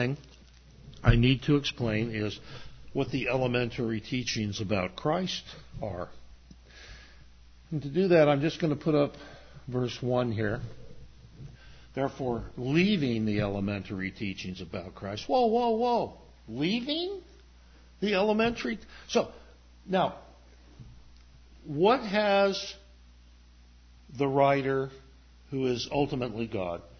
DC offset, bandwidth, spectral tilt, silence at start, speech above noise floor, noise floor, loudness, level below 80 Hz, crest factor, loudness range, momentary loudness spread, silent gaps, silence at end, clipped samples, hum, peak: under 0.1%; 6.6 kHz; -6 dB/octave; 0 s; 27 dB; -55 dBFS; -29 LUFS; -46 dBFS; 22 dB; 5 LU; 18 LU; none; 0.15 s; under 0.1%; none; -8 dBFS